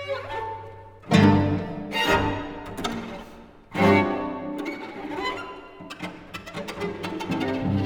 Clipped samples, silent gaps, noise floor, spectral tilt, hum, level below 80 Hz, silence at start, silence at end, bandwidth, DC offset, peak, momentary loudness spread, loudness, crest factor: under 0.1%; none; -46 dBFS; -6.5 dB/octave; none; -48 dBFS; 0 s; 0 s; over 20 kHz; under 0.1%; -4 dBFS; 19 LU; -25 LUFS; 22 dB